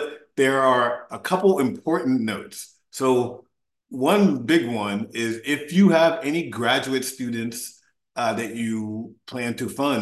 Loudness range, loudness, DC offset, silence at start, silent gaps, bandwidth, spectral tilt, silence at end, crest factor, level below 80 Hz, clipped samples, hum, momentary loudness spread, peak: 5 LU; -22 LUFS; under 0.1%; 0 s; none; 12.5 kHz; -5 dB/octave; 0 s; 18 dB; -66 dBFS; under 0.1%; none; 14 LU; -4 dBFS